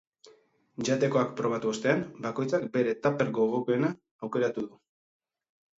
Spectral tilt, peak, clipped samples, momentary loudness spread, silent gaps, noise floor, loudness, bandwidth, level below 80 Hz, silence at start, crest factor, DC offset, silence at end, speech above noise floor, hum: -6 dB/octave; -10 dBFS; under 0.1%; 8 LU; 4.11-4.19 s; -60 dBFS; -29 LUFS; 8 kHz; -72 dBFS; 0.25 s; 20 dB; under 0.1%; 1.1 s; 32 dB; none